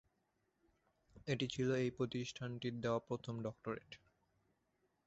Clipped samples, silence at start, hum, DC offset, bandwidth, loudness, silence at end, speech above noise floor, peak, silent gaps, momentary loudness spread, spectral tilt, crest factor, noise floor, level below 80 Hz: under 0.1%; 1.15 s; none; under 0.1%; 8 kHz; -42 LUFS; 1.1 s; 42 dB; -24 dBFS; none; 12 LU; -5.5 dB/octave; 20 dB; -83 dBFS; -72 dBFS